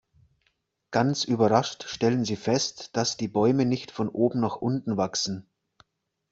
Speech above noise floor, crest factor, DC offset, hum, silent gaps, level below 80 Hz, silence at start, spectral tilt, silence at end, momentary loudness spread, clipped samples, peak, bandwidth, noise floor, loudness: 48 dB; 22 dB; under 0.1%; none; none; -64 dBFS; 0.9 s; -5 dB/octave; 0.9 s; 7 LU; under 0.1%; -4 dBFS; 8 kHz; -73 dBFS; -26 LUFS